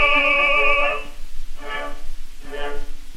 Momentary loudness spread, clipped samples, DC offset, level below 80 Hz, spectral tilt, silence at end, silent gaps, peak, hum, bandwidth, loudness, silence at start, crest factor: 25 LU; under 0.1%; 0.3%; -28 dBFS; -3 dB/octave; 0 s; none; -4 dBFS; none; 9.2 kHz; -18 LUFS; 0 s; 14 dB